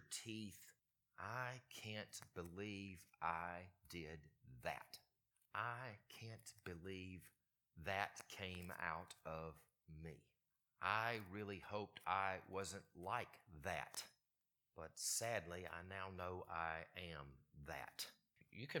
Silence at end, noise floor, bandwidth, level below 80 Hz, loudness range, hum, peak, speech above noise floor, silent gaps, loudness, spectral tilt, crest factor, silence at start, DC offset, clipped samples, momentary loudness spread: 0 s; under -90 dBFS; 19 kHz; -74 dBFS; 6 LU; none; -24 dBFS; over 40 dB; none; -49 LUFS; -3 dB/octave; 28 dB; 0 s; under 0.1%; under 0.1%; 16 LU